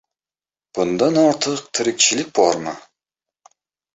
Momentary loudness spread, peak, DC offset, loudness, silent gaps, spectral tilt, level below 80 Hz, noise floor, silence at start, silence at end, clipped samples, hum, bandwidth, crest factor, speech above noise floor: 14 LU; -2 dBFS; under 0.1%; -18 LUFS; none; -3 dB/octave; -62 dBFS; under -90 dBFS; 0.75 s; 1.15 s; under 0.1%; none; 8.2 kHz; 18 dB; over 72 dB